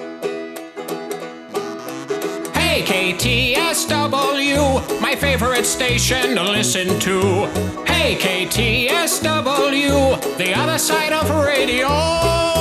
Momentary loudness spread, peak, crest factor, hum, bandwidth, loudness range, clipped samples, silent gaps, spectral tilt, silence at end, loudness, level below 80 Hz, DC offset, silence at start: 11 LU; 0 dBFS; 18 dB; none; 14.5 kHz; 2 LU; under 0.1%; none; -3.5 dB/octave; 0 s; -17 LUFS; -36 dBFS; under 0.1%; 0 s